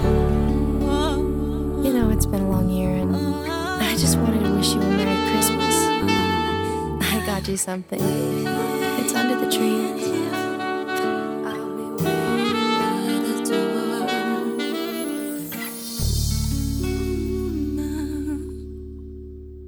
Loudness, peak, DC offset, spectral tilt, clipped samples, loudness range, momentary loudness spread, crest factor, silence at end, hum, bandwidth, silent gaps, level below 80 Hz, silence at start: -22 LUFS; -4 dBFS; under 0.1%; -5 dB/octave; under 0.1%; 6 LU; 9 LU; 18 dB; 0 s; none; over 20 kHz; none; -32 dBFS; 0 s